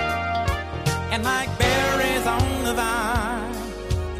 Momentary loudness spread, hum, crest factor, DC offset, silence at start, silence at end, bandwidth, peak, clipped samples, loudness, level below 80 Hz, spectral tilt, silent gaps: 8 LU; none; 18 dB; under 0.1%; 0 s; 0 s; 15.5 kHz; -6 dBFS; under 0.1%; -23 LUFS; -34 dBFS; -4.5 dB/octave; none